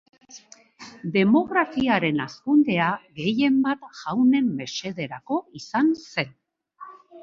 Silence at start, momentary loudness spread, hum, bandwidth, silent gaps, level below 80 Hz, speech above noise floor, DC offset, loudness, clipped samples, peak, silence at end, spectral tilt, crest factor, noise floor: 0.35 s; 12 LU; none; 7.4 kHz; none; -64 dBFS; 26 dB; under 0.1%; -23 LUFS; under 0.1%; -6 dBFS; 0 s; -6 dB/octave; 18 dB; -49 dBFS